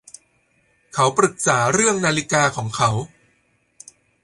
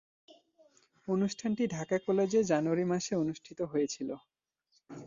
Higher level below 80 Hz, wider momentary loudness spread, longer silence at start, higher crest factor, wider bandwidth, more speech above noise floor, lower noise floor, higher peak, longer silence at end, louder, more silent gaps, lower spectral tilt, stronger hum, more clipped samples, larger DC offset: first, -54 dBFS vs -70 dBFS; second, 8 LU vs 12 LU; about the same, 0.95 s vs 1.05 s; about the same, 20 dB vs 18 dB; first, 11.5 kHz vs 7.6 kHz; about the same, 45 dB vs 44 dB; second, -64 dBFS vs -75 dBFS; first, -2 dBFS vs -16 dBFS; first, 1.15 s vs 0 s; first, -19 LUFS vs -32 LUFS; neither; second, -3.5 dB/octave vs -5.5 dB/octave; neither; neither; neither